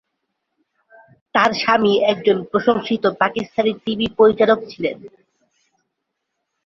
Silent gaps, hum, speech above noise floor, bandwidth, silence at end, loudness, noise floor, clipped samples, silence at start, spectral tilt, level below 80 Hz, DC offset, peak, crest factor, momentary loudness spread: none; none; 60 dB; 7.2 kHz; 1.6 s; -18 LUFS; -77 dBFS; under 0.1%; 1.35 s; -5.5 dB/octave; -56 dBFS; under 0.1%; 0 dBFS; 18 dB; 8 LU